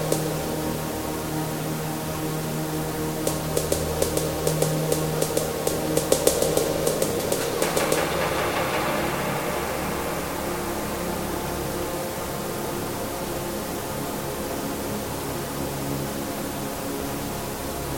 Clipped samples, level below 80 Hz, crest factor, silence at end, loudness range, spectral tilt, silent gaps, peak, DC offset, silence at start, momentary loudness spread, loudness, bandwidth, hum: under 0.1%; -42 dBFS; 24 dB; 0 s; 6 LU; -4 dB/octave; none; -2 dBFS; under 0.1%; 0 s; 6 LU; -26 LUFS; 17 kHz; none